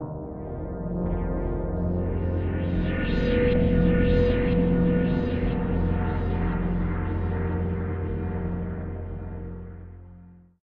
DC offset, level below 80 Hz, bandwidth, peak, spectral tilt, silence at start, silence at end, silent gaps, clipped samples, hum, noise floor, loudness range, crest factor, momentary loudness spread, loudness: under 0.1%; -32 dBFS; 5.2 kHz; -8 dBFS; -10.5 dB/octave; 0 s; 0.3 s; none; under 0.1%; none; -49 dBFS; 7 LU; 16 dB; 14 LU; -26 LUFS